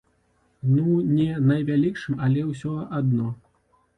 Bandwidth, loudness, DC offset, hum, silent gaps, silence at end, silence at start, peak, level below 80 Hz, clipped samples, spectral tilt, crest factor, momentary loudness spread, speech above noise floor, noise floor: 9 kHz; -23 LUFS; under 0.1%; none; none; 0.65 s; 0.65 s; -10 dBFS; -56 dBFS; under 0.1%; -9.5 dB/octave; 14 dB; 9 LU; 43 dB; -65 dBFS